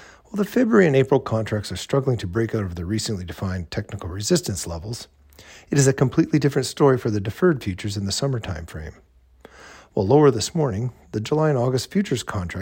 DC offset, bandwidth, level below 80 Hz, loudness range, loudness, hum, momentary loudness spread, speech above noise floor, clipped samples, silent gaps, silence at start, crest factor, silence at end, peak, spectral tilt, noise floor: under 0.1%; 16.5 kHz; -46 dBFS; 5 LU; -22 LUFS; none; 14 LU; 29 dB; under 0.1%; none; 0 s; 18 dB; 0 s; -4 dBFS; -5.5 dB/octave; -50 dBFS